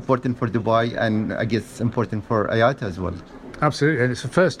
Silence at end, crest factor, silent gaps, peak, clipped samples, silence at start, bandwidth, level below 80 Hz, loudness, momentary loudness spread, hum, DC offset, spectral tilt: 0 s; 16 dB; none; -4 dBFS; under 0.1%; 0 s; 13 kHz; -50 dBFS; -22 LUFS; 8 LU; none; under 0.1%; -6.5 dB/octave